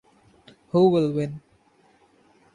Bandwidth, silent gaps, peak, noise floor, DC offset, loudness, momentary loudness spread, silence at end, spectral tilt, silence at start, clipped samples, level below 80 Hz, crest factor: 9.8 kHz; none; -8 dBFS; -60 dBFS; under 0.1%; -22 LUFS; 15 LU; 1.15 s; -9 dB/octave; 0.75 s; under 0.1%; -64 dBFS; 18 dB